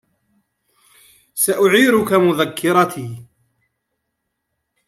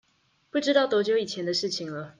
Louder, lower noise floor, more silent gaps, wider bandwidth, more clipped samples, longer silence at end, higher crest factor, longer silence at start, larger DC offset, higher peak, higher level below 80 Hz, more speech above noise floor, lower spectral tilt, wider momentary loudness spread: first, -15 LUFS vs -26 LUFS; first, -75 dBFS vs -68 dBFS; neither; first, 16 kHz vs 9.8 kHz; neither; first, 1.65 s vs 0.1 s; about the same, 18 dB vs 18 dB; first, 1.35 s vs 0.55 s; neither; first, -2 dBFS vs -8 dBFS; first, -62 dBFS vs -74 dBFS; first, 60 dB vs 42 dB; about the same, -4 dB/octave vs -4 dB/octave; first, 18 LU vs 9 LU